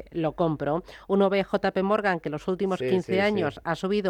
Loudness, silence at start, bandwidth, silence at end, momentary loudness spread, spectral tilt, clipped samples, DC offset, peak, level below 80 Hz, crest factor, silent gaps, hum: -26 LUFS; 0 s; 10 kHz; 0 s; 6 LU; -7 dB/octave; under 0.1%; under 0.1%; -10 dBFS; -54 dBFS; 14 dB; none; none